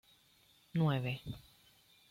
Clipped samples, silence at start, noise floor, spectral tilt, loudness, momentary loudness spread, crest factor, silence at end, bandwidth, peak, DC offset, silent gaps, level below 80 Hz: under 0.1%; 0.75 s; -68 dBFS; -7.5 dB/octave; -37 LUFS; 16 LU; 16 dB; 0.7 s; 16 kHz; -22 dBFS; under 0.1%; none; -66 dBFS